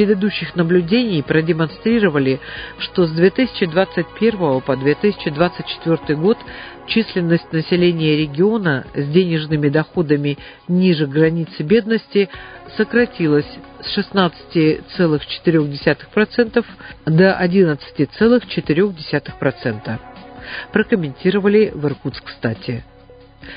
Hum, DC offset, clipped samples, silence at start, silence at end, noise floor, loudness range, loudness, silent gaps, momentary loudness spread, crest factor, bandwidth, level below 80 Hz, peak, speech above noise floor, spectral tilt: none; under 0.1%; under 0.1%; 0 s; 0 s; -44 dBFS; 3 LU; -17 LUFS; none; 10 LU; 16 dB; 5.2 kHz; -46 dBFS; 0 dBFS; 27 dB; -12 dB/octave